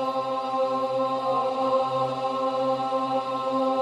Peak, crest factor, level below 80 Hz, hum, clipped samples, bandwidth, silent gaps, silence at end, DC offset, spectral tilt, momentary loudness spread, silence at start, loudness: -12 dBFS; 12 dB; -72 dBFS; none; under 0.1%; 10.5 kHz; none; 0 s; under 0.1%; -6 dB/octave; 3 LU; 0 s; -26 LUFS